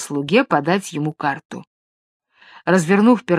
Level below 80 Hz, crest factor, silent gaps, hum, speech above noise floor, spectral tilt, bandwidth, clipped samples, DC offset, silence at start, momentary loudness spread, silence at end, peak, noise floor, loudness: -66 dBFS; 18 dB; 1.45-1.49 s, 1.67-2.20 s; none; over 73 dB; -6 dB/octave; 13.5 kHz; under 0.1%; under 0.1%; 0 s; 15 LU; 0 s; 0 dBFS; under -90 dBFS; -18 LUFS